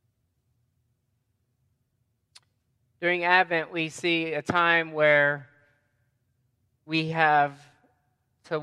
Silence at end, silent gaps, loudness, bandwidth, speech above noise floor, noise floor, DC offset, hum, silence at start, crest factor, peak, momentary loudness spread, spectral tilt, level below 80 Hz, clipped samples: 0 s; none; -24 LUFS; 12 kHz; 50 dB; -75 dBFS; under 0.1%; none; 3 s; 24 dB; -4 dBFS; 9 LU; -5 dB/octave; -72 dBFS; under 0.1%